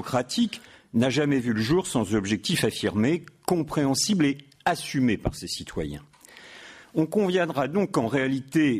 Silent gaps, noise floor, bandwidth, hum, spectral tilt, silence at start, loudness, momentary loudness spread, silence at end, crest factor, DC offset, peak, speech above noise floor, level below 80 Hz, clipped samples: none; -48 dBFS; 15.5 kHz; none; -5 dB/octave; 0 s; -25 LUFS; 10 LU; 0 s; 14 dB; under 0.1%; -10 dBFS; 24 dB; -50 dBFS; under 0.1%